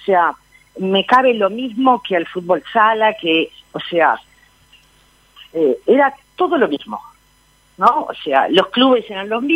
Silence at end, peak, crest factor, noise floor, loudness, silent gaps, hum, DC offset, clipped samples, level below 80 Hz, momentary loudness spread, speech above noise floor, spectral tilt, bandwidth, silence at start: 0 s; 0 dBFS; 16 dB; -54 dBFS; -16 LUFS; none; none; under 0.1%; under 0.1%; -60 dBFS; 11 LU; 39 dB; -6 dB/octave; 12.5 kHz; 0.05 s